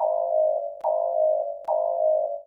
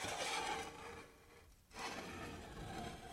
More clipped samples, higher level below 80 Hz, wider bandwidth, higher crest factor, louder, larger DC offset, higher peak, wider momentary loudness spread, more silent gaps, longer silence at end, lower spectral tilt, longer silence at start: neither; second, -74 dBFS vs -62 dBFS; second, 1.5 kHz vs 16 kHz; second, 12 dB vs 18 dB; first, -24 LUFS vs -46 LUFS; neither; first, -12 dBFS vs -30 dBFS; second, 4 LU vs 21 LU; neither; about the same, 0.05 s vs 0 s; first, -6.5 dB/octave vs -2.5 dB/octave; about the same, 0 s vs 0 s